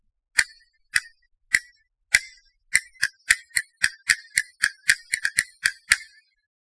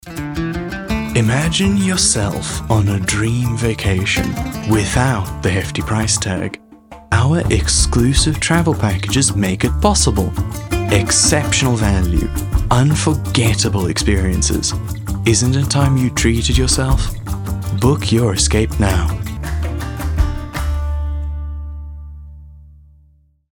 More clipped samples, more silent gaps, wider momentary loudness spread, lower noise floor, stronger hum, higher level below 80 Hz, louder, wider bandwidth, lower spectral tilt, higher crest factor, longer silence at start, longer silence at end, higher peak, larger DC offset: neither; neither; second, 5 LU vs 10 LU; first, -57 dBFS vs -52 dBFS; neither; second, -58 dBFS vs -24 dBFS; second, -23 LUFS vs -16 LUFS; second, 11 kHz vs 18 kHz; second, 3 dB/octave vs -4.5 dB/octave; first, 26 dB vs 16 dB; first, 0.35 s vs 0.05 s; second, 0.6 s vs 0.9 s; about the same, 0 dBFS vs 0 dBFS; neither